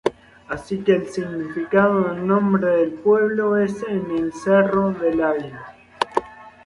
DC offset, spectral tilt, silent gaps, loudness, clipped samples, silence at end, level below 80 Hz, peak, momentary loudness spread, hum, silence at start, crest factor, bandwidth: under 0.1%; -7 dB/octave; none; -20 LUFS; under 0.1%; 0.15 s; -54 dBFS; -2 dBFS; 10 LU; none; 0.05 s; 18 dB; 11.5 kHz